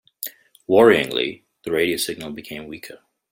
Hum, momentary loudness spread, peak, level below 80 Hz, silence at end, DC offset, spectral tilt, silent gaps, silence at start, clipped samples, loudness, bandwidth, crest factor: none; 22 LU; -2 dBFS; -58 dBFS; 0.35 s; under 0.1%; -4 dB/octave; none; 0.2 s; under 0.1%; -19 LUFS; 16.5 kHz; 20 dB